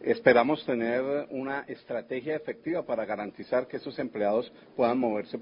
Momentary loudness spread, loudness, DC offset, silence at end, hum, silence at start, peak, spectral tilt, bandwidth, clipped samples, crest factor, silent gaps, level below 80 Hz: 13 LU; -29 LUFS; under 0.1%; 0 s; none; 0 s; -6 dBFS; -10 dB/octave; 5.4 kHz; under 0.1%; 22 dB; none; -68 dBFS